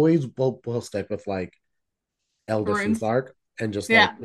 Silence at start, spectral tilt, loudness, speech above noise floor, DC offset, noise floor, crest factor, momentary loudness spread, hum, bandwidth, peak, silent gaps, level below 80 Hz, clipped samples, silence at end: 0 s; -5.5 dB/octave; -24 LUFS; 57 dB; under 0.1%; -81 dBFS; 20 dB; 13 LU; none; 12.5 kHz; -4 dBFS; none; -64 dBFS; under 0.1%; 0 s